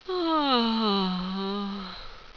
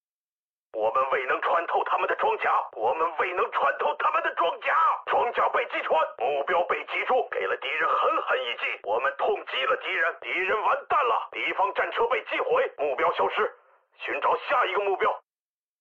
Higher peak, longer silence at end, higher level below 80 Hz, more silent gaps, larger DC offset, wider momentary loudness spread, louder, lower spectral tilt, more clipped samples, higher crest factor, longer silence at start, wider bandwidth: first, -10 dBFS vs -14 dBFS; second, 0.05 s vs 0.6 s; first, -50 dBFS vs -70 dBFS; neither; neither; first, 14 LU vs 4 LU; about the same, -26 LUFS vs -25 LUFS; first, -7 dB/octave vs 1 dB/octave; neither; first, 18 dB vs 12 dB; second, 0.05 s vs 0.75 s; second, 5.4 kHz vs 7.4 kHz